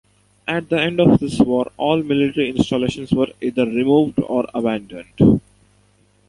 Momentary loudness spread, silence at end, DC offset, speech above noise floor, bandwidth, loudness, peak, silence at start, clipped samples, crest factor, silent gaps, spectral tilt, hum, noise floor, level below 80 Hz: 8 LU; 0.9 s; under 0.1%; 39 dB; 11.5 kHz; -18 LUFS; -2 dBFS; 0.45 s; under 0.1%; 18 dB; none; -7 dB/octave; 50 Hz at -45 dBFS; -57 dBFS; -44 dBFS